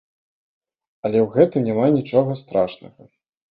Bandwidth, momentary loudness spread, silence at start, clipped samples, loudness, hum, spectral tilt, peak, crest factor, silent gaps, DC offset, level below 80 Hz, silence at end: 5 kHz; 6 LU; 1.05 s; under 0.1%; -20 LUFS; none; -12 dB/octave; -2 dBFS; 20 dB; none; under 0.1%; -60 dBFS; 0.65 s